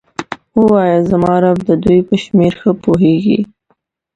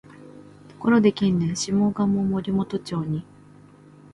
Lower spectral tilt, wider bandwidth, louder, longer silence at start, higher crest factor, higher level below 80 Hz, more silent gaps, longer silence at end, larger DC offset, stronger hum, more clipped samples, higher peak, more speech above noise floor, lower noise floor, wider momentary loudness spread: first, -8.5 dB/octave vs -6.5 dB/octave; second, 9 kHz vs 11 kHz; first, -12 LUFS vs -23 LUFS; about the same, 0.2 s vs 0.15 s; second, 12 dB vs 18 dB; first, -42 dBFS vs -56 dBFS; neither; second, 0.7 s vs 0.9 s; neither; second, none vs 50 Hz at -40 dBFS; neither; first, 0 dBFS vs -6 dBFS; first, 50 dB vs 27 dB; first, -61 dBFS vs -49 dBFS; about the same, 7 LU vs 9 LU